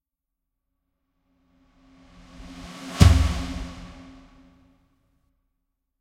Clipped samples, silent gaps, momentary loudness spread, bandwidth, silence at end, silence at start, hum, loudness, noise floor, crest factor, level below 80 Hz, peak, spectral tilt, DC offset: under 0.1%; none; 28 LU; 14 kHz; 2.15 s; 2.5 s; none; -21 LUFS; -84 dBFS; 28 dB; -32 dBFS; 0 dBFS; -6 dB/octave; under 0.1%